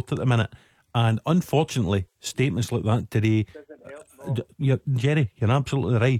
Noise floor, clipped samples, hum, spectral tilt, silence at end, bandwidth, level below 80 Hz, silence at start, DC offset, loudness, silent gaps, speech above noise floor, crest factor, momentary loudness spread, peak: -44 dBFS; under 0.1%; none; -6.5 dB/octave; 0 s; 15 kHz; -52 dBFS; 0.1 s; under 0.1%; -24 LUFS; none; 21 dB; 16 dB; 11 LU; -8 dBFS